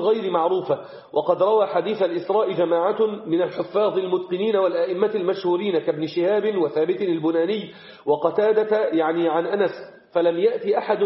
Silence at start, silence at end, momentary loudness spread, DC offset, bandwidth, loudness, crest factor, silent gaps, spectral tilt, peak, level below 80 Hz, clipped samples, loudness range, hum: 0 s; 0 s; 5 LU; under 0.1%; 5.8 kHz; -22 LUFS; 16 dB; none; -4.5 dB/octave; -6 dBFS; -72 dBFS; under 0.1%; 1 LU; none